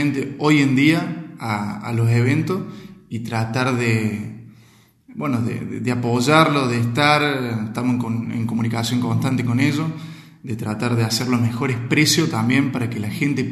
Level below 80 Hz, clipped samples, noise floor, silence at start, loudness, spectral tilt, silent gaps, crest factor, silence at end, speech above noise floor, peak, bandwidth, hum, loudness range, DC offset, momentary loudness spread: -58 dBFS; under 0.1%; -52 dBFS; 0 s; -20 LUFS; -5.5 dB/octave; none; 20 dB; 0 s; 32 dB; 0 dBFS; 13 kHz; none; 4 LU; under 0.1%; 13 LU